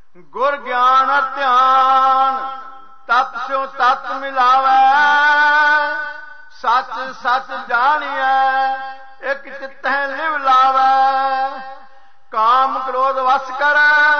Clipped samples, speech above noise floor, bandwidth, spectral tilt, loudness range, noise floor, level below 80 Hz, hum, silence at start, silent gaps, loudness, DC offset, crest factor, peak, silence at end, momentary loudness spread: under 0.1%; 33 dB; 6.6 kHz; -1.5 dB/octave; 4 LU; -48 dBFS; -62 dBFS; none; 0.35 s; none; -15 LUFS; 1%; 10 dB; -6 dBFS; 0 s; 14 LU